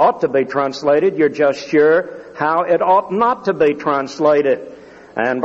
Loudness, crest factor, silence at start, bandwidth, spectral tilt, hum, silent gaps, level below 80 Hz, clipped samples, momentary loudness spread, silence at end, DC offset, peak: -16 LUFS; 14 dB; 0 s; 7.8 kHz; -6 dB/octave; none; none; -60 dBFS; under 0.1%; 8 LU; 0 s; under 0.1%; -2 dBFS